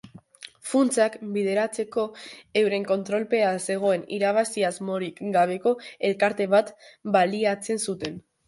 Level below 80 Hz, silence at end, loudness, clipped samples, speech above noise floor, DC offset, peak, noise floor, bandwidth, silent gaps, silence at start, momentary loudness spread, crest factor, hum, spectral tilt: -70 dBFS; 0.3 s; -25 LUFS; under 0.1%; 23 dB; under 0.1%; -6 dBFS; -47 dBFS; 11.5 kHz; none; 0.05 s; 10 LU; 18 dB; none; -4.5 dB/octave